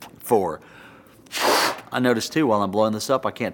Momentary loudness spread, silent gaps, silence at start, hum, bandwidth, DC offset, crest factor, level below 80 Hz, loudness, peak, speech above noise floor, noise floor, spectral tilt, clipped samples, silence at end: 6 LU; none; 0 s; none; 18 kHz; under 0.1%; 18 dB; -62 dBFS; -22 LUFS; -4 dBFS; 26 dB; -48 dBFS; -4 dB/octave; under 0.1%; 0 s